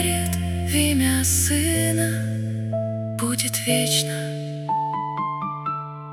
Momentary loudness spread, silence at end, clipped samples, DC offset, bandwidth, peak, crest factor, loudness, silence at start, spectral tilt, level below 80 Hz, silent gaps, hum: 9 LU; 0 s; under 0.1%; under 0.1%; 18 kHz; -4 dBFS; 20 dB; -22 LUFS; 0 s; -4 dB/octave; -46 dBFS; none; none